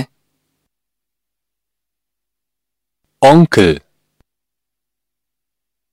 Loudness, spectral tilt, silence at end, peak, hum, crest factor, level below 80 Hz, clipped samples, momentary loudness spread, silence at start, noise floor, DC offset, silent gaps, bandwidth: -10 LUFS; -6.5 dB/octave; 2.15 s; 0 dBFS; none; 18 dB; -46 dBFS; 0.2%; 16 LU; 0 s; -83 dBFS; under 0.1%; none; 13.5 kHz